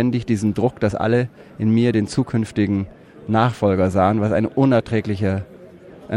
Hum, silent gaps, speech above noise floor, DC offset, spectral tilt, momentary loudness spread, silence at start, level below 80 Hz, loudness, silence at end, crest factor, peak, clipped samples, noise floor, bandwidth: none; none; 23 dB; under 0.1%; -7.5 dB/octave; 8 LU; 0 s; -50 dBFS; -19 LUFS; 0 s; 16 dB; -4 dBFS; under 0.1%; -42 dBFS; 11.5 kHz